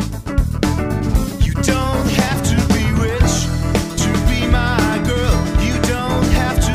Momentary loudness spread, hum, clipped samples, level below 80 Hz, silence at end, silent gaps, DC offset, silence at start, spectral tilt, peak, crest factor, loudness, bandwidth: 3 LU; none; under 0.1%; -20 dBFS; 0 s; none; under 0.1%; 0 s; -5 dB/octave; 0 dBFS; 16 dB; -17 LUFS; 16 kHz